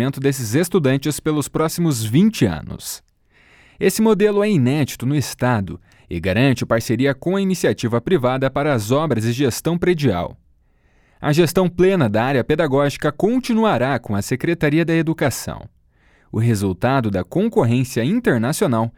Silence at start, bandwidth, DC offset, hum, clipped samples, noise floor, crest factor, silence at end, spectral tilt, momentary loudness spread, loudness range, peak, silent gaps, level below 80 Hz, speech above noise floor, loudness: 0 s; 19 kHz; under 0.1%; none; under 0.1%; -57 dBFS; 16 dB; 0.1 s; -6 dB/octave; 7 LU; 2 LU; -2 dBFS; none; -46 dBFS; 39 dB; -18 LUFS